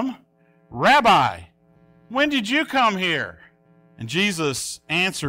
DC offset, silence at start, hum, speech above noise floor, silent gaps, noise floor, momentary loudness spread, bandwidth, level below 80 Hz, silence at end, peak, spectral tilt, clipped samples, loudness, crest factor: under 0.1%; 0 s; none; 38 dB; none; -58 dBFS; 15 LU; 16 kHz; -56 dBFS; 0 s; -6 dBFS; -3.5 dB/octave; under 0.1%; -20 LUFS; 16 dB